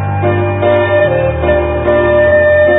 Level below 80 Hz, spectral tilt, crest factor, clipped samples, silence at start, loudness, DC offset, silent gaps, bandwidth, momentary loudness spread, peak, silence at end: -26 dBFS; -11 dB/octave; 10 dB; under 0.1%; 0 s; -11 LUFS; under 0.1%; none; 3.9 kHz; 5 LU; 0 dBFS; 0 s